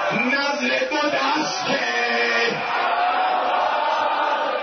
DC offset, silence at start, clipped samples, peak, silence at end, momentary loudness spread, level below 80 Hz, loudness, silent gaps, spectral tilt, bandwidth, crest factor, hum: under 0.1%; 0 s; under 0.1%; -8 dBFS; 0 s; 2 LU; -68 dBFS; -20 LUFS; none; -2.5 dB/octave; 6.6 kHz; 12 dB; none